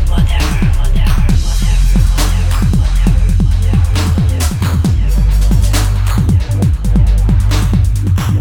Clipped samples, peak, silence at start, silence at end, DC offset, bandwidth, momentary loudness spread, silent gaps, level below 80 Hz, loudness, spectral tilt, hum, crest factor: under 0.1%; 0 dBFS; 0 s; 0 s; under 0.1%; 17.5 kHz; 2 LU; none; -12 dBFS; -13 LUFS; -6 dB/octave; none; 10 dB